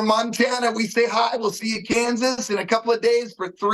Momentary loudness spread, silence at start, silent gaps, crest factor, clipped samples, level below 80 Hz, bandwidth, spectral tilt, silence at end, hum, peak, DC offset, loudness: 5 LU; 0 s; none; 16 dB; under 0.1%; -62 dBFS; 12.5 kHz; -3 dB/octave; 0 s; none; -6 dBFS; under 0.1%; -21 LUFS